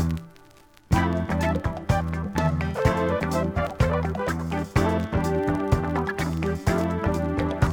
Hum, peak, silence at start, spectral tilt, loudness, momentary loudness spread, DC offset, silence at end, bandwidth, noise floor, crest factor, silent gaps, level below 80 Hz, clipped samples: none; -6 dBFS; 0 s; -7 dB/octave; -25 LUFS; 4 LU; under 0.1%; 0 s; 18.5 kHz; -52 dBFS; 18 dB; none; -36 dBFS; under 0.1%